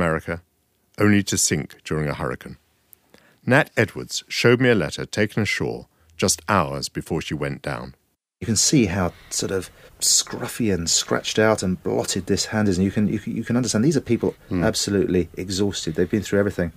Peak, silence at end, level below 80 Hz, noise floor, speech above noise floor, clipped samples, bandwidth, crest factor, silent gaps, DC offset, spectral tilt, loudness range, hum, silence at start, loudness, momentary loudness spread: -2 dBFS; 0.05 s; -48 dBFS; -64 dBFS; 43 dB; under 0.1%; 15.5 kHz; 20 dB; none; under 0.1%; -4 dB/octave; 3 LU; none; 0 s; -21 LUFS; 11 LU